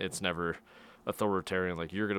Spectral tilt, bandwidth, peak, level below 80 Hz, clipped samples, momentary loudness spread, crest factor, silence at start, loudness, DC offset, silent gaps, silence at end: -4.5 dB/octave; 18.5 kHz; -14 dBFS; -66 dBFS; under 0.1%; 9 LU; 20 dB; 0 s; -34 LUFS; under 0.1%; none; 0 s